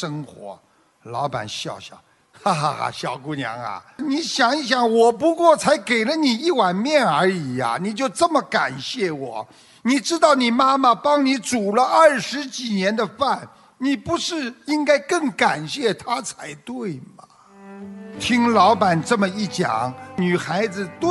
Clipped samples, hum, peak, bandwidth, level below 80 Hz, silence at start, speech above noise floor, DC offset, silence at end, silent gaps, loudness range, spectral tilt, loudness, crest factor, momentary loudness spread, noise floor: under 0.1%; none; -2 dBFS; 11.5 kHz; -62 dBFS; 0 s; 23 dB; under 0.1%; 0 s; none; 7 LU; -4.5 dB/octave; -20 LUFS; 18 dB; 15 LU; -43 dBFS